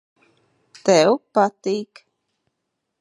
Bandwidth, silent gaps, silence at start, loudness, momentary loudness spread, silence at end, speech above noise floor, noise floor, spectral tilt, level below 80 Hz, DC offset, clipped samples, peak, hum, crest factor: 11.5 kHz; none; 0.85 s; -19 LUFS; 11 LU; 1.15 s; 59 dB; -78 dBFS; -4.5 dB/octave; -76 dBFS; under 0.1%; under 0.1%; -2 dBFS; none; 20 dB